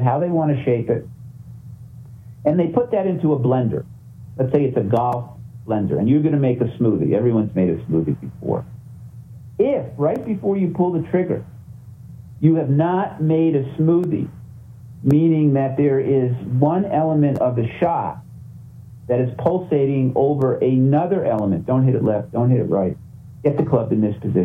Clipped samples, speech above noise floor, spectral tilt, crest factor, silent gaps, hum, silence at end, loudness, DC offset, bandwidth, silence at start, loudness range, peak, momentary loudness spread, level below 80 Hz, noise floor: under 0.1%; 21 dB; -11 dB/octave; 16 dB; none; none; 0 s; -19 LUFS; under 0.1%; 3.7 kHz; 0 s; 4 LU; -2 dBFS; 22 LU; -52 dBFS; -39 dBFS